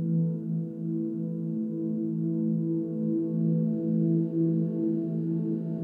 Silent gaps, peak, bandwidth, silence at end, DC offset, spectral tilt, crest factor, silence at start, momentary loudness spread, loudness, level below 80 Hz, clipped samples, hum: none; -16 dBFS; 1.6 kHz; 0 s; under 0.1%; -13.5 dB/octave; 12 dB; 0 s; 5 LU; -29 LUFS; -82 dBFS; under 0.1%; none